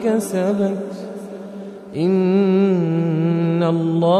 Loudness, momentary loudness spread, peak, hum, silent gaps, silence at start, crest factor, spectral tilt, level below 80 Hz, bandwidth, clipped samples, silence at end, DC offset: -18 LUFS; 16 LU; -4 dBFS; none; none; 0 s; 14 dB; -8 dB/octave; -66 dBFS; 13.5 kHz; under 0.1%; 0 s; under 0.1%